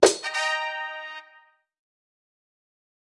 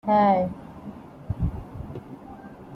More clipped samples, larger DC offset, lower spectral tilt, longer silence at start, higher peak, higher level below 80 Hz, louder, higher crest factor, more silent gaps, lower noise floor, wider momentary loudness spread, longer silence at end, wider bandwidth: neither; neither; second, -1 dB/octave vs -9.5 dB/octave; about the same, 0 s vs 0.05 s; first, 0 dBFS vs -10 dBFS; second, -66 dBFS vs -42 dBFS; about the same, -26 LUFS vs -24 LUFS; first, 28 dB vs 18 dB; neither; first, -58 dBFS vs -43 dBFS; second, 16 LU vs 23 LU; first, 1.8 s vs 0 s; first, 12 kHz vs 5.8 kHz